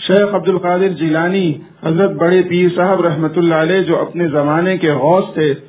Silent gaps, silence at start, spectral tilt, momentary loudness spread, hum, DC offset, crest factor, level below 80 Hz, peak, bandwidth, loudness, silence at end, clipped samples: none; 0 s; -11 dB/octave; 4 LU; none; under 0.1%; 14 dB; -56 dBFS; 0 dBFS; 4 kHz; -14 LUFS; 0.1 s; under 0.1%